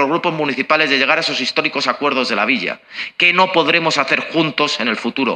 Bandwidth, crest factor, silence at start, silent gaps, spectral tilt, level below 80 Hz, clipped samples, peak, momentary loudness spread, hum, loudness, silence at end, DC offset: 9.8 kHz; 16 dB; 0 s; none; -3.5 dB/octave; -66 dBFS; under 0.1%; 0 dBFS; 6 LU; none; -15 LUFS; 0 s; under 0.1%